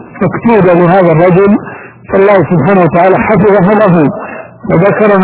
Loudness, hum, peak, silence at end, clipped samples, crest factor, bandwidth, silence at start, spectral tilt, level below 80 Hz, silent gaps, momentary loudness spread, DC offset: -7 LUFS; none; 0 dBFS; 0 s; 3%; 6 dB; 4 kHz; 0 s; -12 dB/octave; -38 dBFS; none; 8 LU; under 0.1%